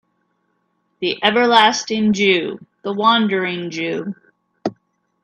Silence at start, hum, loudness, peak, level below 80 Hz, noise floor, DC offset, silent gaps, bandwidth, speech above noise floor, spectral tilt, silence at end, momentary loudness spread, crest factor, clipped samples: 1 s; none; -17 LUFS; 0 dBFS; -64 dBFS; -67 dBFS; under 0.1%; none; 10.5 kHz; 51 dB; -4 dB/octave; 0.5 s; 16 LU; 20 dB; under 0.1%